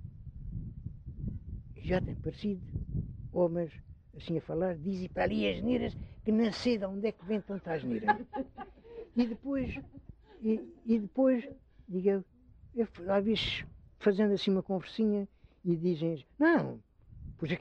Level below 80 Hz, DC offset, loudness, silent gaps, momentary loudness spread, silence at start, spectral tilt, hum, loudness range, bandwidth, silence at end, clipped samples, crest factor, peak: -52 dBFS; under 0.1%; -33 LUFS; none; 16 LU; 0 s; -7.5 dB/octave; none; 5 LU; 8.4 kHz; 0 s; under 0.1%; 20 dB; -14 dBFS